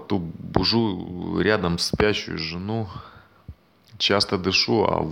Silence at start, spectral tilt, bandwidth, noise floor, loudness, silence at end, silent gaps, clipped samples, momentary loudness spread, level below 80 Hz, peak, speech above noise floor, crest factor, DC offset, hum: 0 s; -4.5 dB/octave; 16.5 kHz; -48 dBFS; -23 LUFS; 0 s; none; under 0.1%; 9 LU; -46 dBFS; -4 dBFS; 25 dB; 20 dB; under 0.1%; none